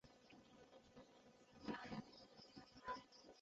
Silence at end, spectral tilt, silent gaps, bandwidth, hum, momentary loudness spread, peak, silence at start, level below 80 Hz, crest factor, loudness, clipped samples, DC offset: 0 s; -3.5 dB/octave; none; 7.6 kHz; none; 15 LU; -36 dBFS; 0.05 s; -80 dBFS; 22 dB; -57 LUFS; under 0.1%; under 0.1%